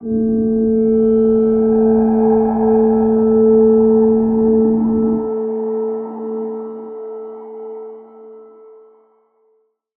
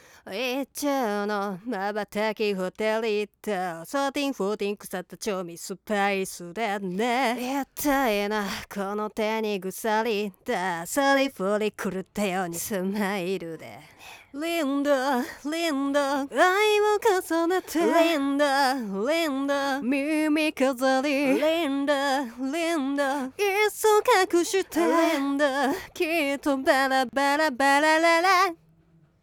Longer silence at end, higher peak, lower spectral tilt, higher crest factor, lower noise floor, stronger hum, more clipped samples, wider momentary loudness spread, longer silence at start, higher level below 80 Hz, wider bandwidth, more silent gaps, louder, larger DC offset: first, 1.55 s vs 0.65 s; first, -4 dBFS vs -8 dBFS; first, -14.5 dB/octave vs -3.5 dB/octave; about the same, 12 dB vs 16 dB; about the same, -61 dBFS vs -60 dBFS; neither; neither; first, 18 LU vs 10 LU; second, 0 s vs 0.25 s; first, -44 dBFS vs -62 dBFS; second, 1.9 kHz vs over 20 kHz; neither; first, -14 LUFS vs -25 LUFS; neither